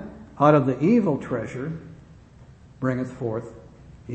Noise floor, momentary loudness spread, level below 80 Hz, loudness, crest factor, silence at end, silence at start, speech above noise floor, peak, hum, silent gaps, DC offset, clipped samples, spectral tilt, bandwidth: -48 dBFS; 17 LU; -54 dBFS; -23 LUFS; 22 dB; 0 s; 0 s; 26 dB; -4 dBFS; none; none; under 0.1%; under 0.1%; -9 dB/octave; 8.4 kHz